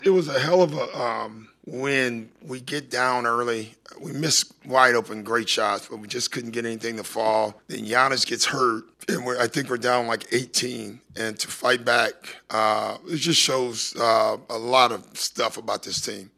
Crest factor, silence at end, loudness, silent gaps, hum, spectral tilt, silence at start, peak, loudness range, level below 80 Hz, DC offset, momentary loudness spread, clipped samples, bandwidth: 22 dB; 0.1 s; -23 LUFS; none; none; -2.5 dB/octave; 0 s; -2 dBFS; 3 LU; -70 dBFS; under 0.1%; 12 LU; under 0.1%; 13.5 kHz